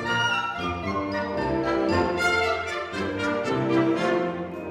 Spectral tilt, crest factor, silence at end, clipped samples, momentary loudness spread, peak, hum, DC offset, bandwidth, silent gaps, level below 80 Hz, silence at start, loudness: -5 dB/octave; 14 dB; 0 s; under 0.1%; 7 LU; -10 dBFS; none; under 0.1%; 13 kHz; none; -48 dBFS; 0 s; -25 LUFS